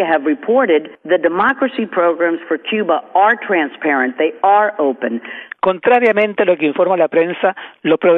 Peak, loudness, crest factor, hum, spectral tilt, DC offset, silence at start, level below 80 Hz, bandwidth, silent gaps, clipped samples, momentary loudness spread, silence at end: -2 dBFS; -15 LUFS; 14 dB; none; -7.5 dB/octave; under 0.1%; 0 s; -64 dBFS; 4.1 kHz; none; under 0.1%; 6 LU; 0 s